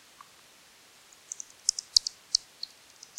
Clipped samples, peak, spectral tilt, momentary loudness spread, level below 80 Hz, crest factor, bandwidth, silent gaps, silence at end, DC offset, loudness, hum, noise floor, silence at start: under 0.1%; -4 dBFS; 3 dB/octave; 18 LU; -66 dBFS; 30 dB; 16.5 kHz; none; 0.8 s; under 0.1%; -27 LUFS; none; -57 dBFS; 1.95 s